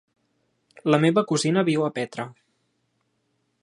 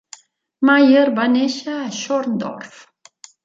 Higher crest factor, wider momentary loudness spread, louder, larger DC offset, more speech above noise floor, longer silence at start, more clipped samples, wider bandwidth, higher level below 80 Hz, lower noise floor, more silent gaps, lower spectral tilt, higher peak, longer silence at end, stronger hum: first, 22 dB vs 16 dB; second, 13 LU vs 16 LU; second, -23 LUFS vs -17 LUFS; neither; first, 50 dB vs 30 dB; first, 0.85 s vs 0.6 s; neither; first, 11 kHz vs 7.6 kHz; about the same, -72 dBFS vs -70 dBFS; first, -72 dBFS vs -47 dBFS; neither; about the same, -5.5 dB/octave vs -4.5 dB/octave; about the same, -2 dBFS vs -2 dBFS; first, 1.3 s vs 0.8 s; neither